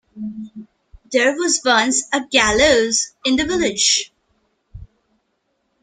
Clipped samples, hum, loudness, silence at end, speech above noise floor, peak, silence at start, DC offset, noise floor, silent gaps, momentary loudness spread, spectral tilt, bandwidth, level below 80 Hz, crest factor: under 0.1%; none; -16 LUFS; 1 s; 52 dB; -2 dBFS; 0.15 s; under 0.1%; -69 dBFS; none; 17 LU; -1.5 dB/octave; 11 kHz; -44 dBFS; 18 dB